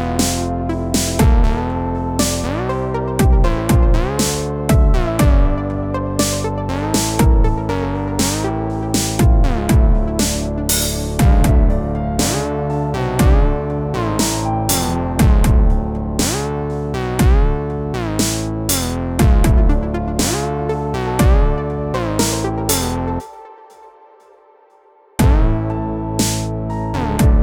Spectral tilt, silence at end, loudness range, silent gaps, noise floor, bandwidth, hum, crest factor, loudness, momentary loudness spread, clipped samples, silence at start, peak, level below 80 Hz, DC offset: -5 dB/octave; 0 s; 4 LU; none; -50 dBFS; over 20 kHz; none; 14 dB; -17 LUFS; 7 LU; under 0.1%; 0 s; -2 dBFS; -18 dBFS; under 0.1%